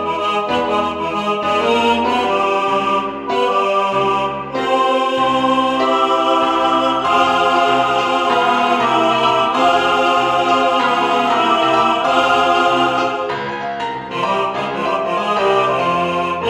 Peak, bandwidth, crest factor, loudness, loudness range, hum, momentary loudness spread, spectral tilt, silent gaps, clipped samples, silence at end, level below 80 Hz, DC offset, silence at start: 0 dBFS; 13.5 kHz; 16 dB; -15 LUFS; 3 LU; none; 6 LU; -4 dB/octave; none; under 0.1%; 0 s; -52 dBFS; under 0.1%; 0 s